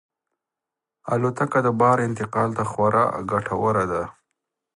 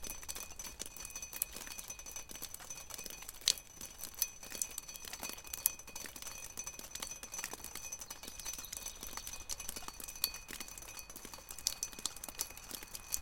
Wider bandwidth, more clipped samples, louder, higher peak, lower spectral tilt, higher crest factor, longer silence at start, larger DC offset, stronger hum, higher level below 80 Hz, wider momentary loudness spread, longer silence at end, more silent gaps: second, 11.5 kHz vs 17 kHz; neither; first, -22 LUFS vs -41 LUFS; about the same, -4 dBFS vs -2 dBFS; first, -7.5 dB/octave vs 0 dB/octave; second, 20 dB vs 42 dB; first, 1.05 s vs 0 s; neither; neither; first, -54 dBFS vs -60 dBFS; about the same, 8 LU vs 10 LU; first, 0.65 s vs 0 s; neither